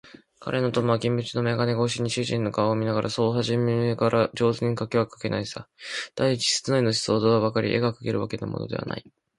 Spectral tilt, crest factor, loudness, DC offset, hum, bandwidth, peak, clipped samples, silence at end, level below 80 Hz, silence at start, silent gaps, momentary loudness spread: -5.5 dB/octave; 18 dB; -25 LUFS; under 0.1%; none; 11.5 kHz; -6 dBFS; under 0.1%; 0.4 s; -58 dBFS; 0.05 s; none; 9 LU